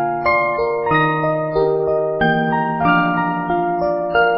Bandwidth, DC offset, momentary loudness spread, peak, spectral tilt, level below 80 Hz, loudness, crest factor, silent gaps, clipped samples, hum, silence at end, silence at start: 5.8 kHz; under 0.1%; 4 LU; -2 dBFS; -11.5 dB/octave; -44 dBFS; -17 LUFS; 14 dB; none; under 0.1%; none; 0 s; 0 s